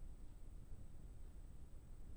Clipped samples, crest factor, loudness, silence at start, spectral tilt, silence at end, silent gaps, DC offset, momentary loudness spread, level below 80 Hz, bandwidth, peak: under 0.1%; 10 dB; -61 LUFS; 0 s; -6.5 dB/octave; 0 s; none; under 0.1%; 1 LU; -54 dBFS; over 20 kHz; -42 dBFS